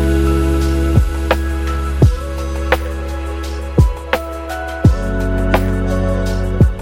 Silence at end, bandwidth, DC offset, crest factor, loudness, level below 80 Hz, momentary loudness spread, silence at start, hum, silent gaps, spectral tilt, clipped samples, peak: 0 s; 16.5 kHz; under 0.1%; 14 dB; -17 LUFS; -18 dBFS; 9 LU; 0 s; none; none; -7 dB/octave; under 0.1%; 0 dBFS